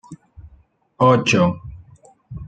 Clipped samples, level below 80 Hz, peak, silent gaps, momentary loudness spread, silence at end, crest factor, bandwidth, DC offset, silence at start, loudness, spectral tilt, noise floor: under 0.1%; -48 dBFS; -2 dBFS; none; 24 LU; 0 s; 20 dB; 9.2 kHz; under 0.1%; 0.1 s; -17 LUFS; -6 dB/octave; -54 dBFS